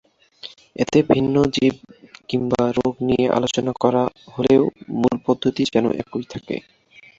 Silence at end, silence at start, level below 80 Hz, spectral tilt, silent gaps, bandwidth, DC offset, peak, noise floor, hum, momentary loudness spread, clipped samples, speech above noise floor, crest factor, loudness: 0.6 s; 0.45 s; -52 dBFS; -6 dB/octave; none; 7.8 kHz; under 0.1%; -2 dBFS; -42 dBFS; none; 14 LU; under 0.1%; 23 dB; 18 dB; -20 LUFS